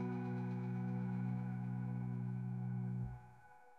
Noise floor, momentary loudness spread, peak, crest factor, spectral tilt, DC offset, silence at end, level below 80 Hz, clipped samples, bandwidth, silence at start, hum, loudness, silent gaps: -63 dBFS; 4 LU; -32 dBFS; 10 dB; -10.5 dB/octave; under 0.1%; 0 s; -66 dBFS; under 0.1%; 4.3 kHz; 0 s; none; -42 LUFS; none